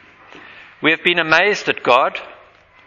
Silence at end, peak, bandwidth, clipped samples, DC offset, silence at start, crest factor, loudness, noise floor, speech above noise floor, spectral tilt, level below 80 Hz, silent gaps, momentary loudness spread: 0.55 s; 0 dBFS; 11 kHz; under 0.1%; under 0.1%; 0.35 s; 18 dB; -15 LUFS; -48 dBFS; 32 dB; -3.5 dB/octave; -58 dBFS; none; 7 LU